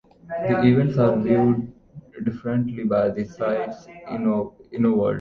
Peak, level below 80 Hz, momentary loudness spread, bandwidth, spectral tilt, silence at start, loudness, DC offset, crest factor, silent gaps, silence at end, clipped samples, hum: -4 dBFS; -54 dBFS; 14 LU; 6.6 kHz; -9.5 dB/octave; 0.25 s; -22 LUFS; under 0.1%; 18 dB; none; 0 s; under 0.1%; none